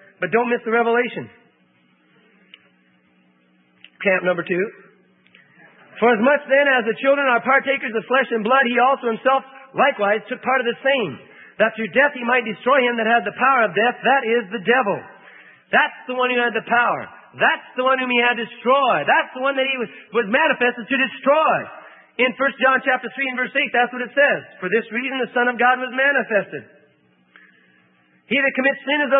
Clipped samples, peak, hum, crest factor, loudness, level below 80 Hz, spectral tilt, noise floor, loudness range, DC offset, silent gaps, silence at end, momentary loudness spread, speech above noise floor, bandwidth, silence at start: under 0.1%; -4 dBFS; none; 16 dB; -19 LUFS; -76 dBFS; -9 dB/octave; -59 dBFS; 7 LU; under 0.1%; none; 0 s; 7 LU; 40 dB; 3.9 kHz; 0.2 s